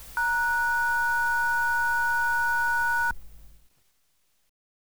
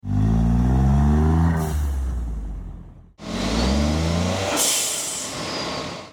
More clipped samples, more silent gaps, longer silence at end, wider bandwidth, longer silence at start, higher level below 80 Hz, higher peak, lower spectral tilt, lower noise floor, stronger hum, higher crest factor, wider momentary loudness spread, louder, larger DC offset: neither; neither; first, 0.4 s vs 0 s; about the same, over 20 kHz vs 19.5 kHz; about the same, 0 s vs 0.05 s; second, -50 dBFS vs -26 dBFS; second, -16 dBFS vs -8 dBFS; second, -0.5 dB/octave vs -4.5 dB/octave; first, -72 dBFS vs -41 dBFS; neither; about the same, 10 dB vs 12 dB; second, 2 LU vs 13 LU; second, -24 LUFS vs -21 LUFS; first, 1% vs under 0.1%